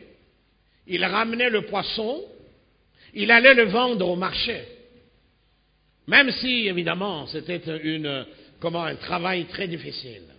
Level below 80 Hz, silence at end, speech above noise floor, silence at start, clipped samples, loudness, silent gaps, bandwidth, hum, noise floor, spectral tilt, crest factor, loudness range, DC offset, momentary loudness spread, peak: -58 dBFS; 0.15 s; 41 dB; 0.9 s; under 0.1%; -22 LUFS; none; 5.2 kHz; none; -64 dBFS; -9 dB/octave; 22 dB; 7 LU; under 0.1%; 17 LU; -2 dBFS